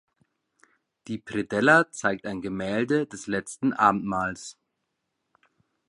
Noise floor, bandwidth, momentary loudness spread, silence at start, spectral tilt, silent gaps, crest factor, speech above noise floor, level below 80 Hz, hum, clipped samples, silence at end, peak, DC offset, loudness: -80 dBFS; 11.5 kHz; 15 LU; 1.05 s; -5 dB/octave; none; 24 dB; 54 dB; -62 dBFS; none; under 0.1%; 1.35 s; -4 dBFS; under 0.1%; -25 LUFS